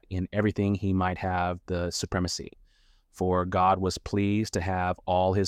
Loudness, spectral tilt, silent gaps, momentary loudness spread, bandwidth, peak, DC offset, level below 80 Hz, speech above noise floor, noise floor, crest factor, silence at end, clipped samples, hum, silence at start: -28 LUFS; -6 dB/octave; none; 7 LU; 14 kHz; -10 dBFS; under 0.1%; -48 dBFS; 35 dB; -62 dBFS; 16 dB; 0 s; under 0.1%; none; 0.1 s